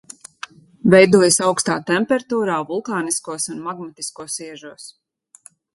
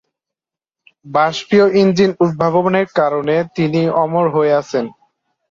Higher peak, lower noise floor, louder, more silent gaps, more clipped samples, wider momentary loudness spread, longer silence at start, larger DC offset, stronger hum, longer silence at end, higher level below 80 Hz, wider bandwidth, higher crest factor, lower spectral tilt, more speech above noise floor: about the same, 0 dBFS vs -2 dBFS; second, -50 dBFS vs -86 dBFS; second, -18 LUFS vs -15 LUFS; neither; neither; first, 24 LU vs 6 LU; second, 0.85 s vs 1.05 s; neither; neither; first, 0.85 s vs 0.6 s; about the same, -60 dBFS vs -56 dBFS; first, 12 kHz vs 7.6 kHz; first, 20 dB vs 14 dB; second, -4 dB/octave vs -6.5 dB/octave; second, 31 dB vs 72 dB